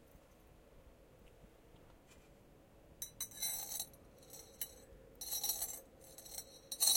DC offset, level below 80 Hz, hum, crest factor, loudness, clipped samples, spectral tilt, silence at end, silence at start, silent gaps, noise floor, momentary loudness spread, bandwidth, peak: under 0.1%; -68 dBFS; none; 28 dB; -42 LUFS; under 0.1%; 0.5 dB/octave; 0 s; 0 s; none; -63 dBFS; 26 LU; 17 kHz; -16 dBFS